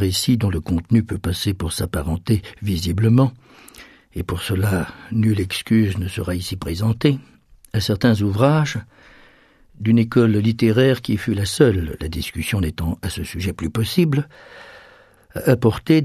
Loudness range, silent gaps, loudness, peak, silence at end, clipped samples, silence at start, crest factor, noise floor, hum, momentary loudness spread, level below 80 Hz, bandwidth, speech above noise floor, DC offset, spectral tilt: 4 LU; none; -20 LUFS; 0 dBFS; 0 s; under 0.1%; 0 s; 18 dB; -52 dBFS; none; 10 LU; -38 dBFS; 14 kHz; 33 dB; under 0.1%; -6.5 dB/octave